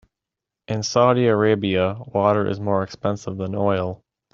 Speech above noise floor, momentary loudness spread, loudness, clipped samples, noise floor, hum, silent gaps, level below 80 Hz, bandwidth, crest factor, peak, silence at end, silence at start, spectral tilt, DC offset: 66 dB; 10 LU; -21 LUFS; under 0.1%; -86 dBFS; none; none; -58 dBFS; 7.6 kHz; 18 dB; -2 dBFS; 0.4 s; 0.7 s; -6 dB/octave; under 0.1%